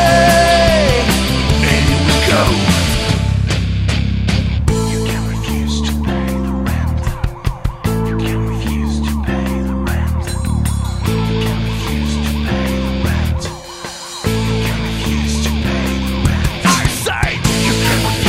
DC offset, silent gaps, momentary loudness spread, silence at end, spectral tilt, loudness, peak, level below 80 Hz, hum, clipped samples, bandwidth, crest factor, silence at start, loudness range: under 0.1%; none; 7 LU; 0 s; -5 dB/octave; -16 LUFS; 0 dBFS; -22 dBFS; none; under 0.1%; 16.5 kHz; 14 dB; 0 s; 5 LU